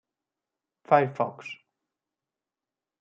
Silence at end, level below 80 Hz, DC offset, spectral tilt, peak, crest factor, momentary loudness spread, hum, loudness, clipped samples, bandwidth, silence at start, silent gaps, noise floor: 1.45 s; -84 dBFS; under 0.1%; -7.5 dB/octave; -6 dBFS; 24 dB; 19 LU; none; -25 LUFS; under 0.1%; 7.4 kHz; 0.9 s; none; under -90 dBFS